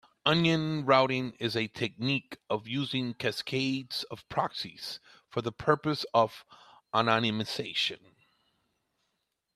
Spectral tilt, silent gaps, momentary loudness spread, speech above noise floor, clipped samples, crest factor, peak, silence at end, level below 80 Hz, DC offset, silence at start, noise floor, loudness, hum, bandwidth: -5.5 dB/octave; none; 11 LU; 51 dB; under 0.1%; 24 dB; -8 dBFS; 1.6 s; -68 dBFS; under 0.1%; 0.25 s; -81 dBFS; -30 LUFS; none; 14 kHz